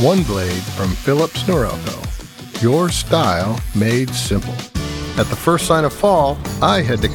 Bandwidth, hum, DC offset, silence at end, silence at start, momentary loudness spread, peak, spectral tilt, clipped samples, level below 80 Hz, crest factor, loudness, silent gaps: over 20 kHz; none; under 0.1%; 0 s; 0 s; 10 LU; 0 dBFS; -5 dB/octave; under 0.1%; -32 dBFS; 16 dB; -17 LUFS; none